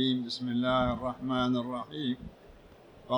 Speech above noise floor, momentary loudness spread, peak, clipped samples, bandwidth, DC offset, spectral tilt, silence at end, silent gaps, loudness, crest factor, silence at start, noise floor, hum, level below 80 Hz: 24 dB; 9 LU; -16 dBFS; under 0.1%; 10 kHz; under 0.1%; -6.5 dB/octave; 0 s; none; -31 LUFS; 16 dB; 0 s; -54 dBFS; none; -52 dBFS